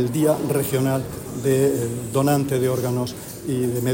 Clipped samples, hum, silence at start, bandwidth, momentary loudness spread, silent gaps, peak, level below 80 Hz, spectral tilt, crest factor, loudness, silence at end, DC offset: under 0.1%; none; 0 s; 16.5 kHz; 7 LU; none; -6 dBFS; -50 dBFS; -6 dB/octave; 14 dB; -22 LUFS; 0 s; under 0.1%